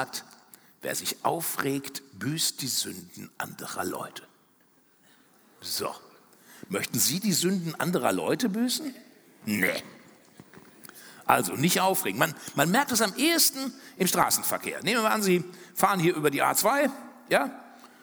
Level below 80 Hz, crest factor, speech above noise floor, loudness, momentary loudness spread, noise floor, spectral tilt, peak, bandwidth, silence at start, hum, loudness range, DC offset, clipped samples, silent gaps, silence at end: -72 dBFS; 24 dB; 36 dB; -26 LUFS; 15 LU; -63 dBFS; -3 dB/octave; -4 dBFS; over 20 kHz; 0 s; none; 11 LU; under 0.1%; under 0.1%; none; 0.15 s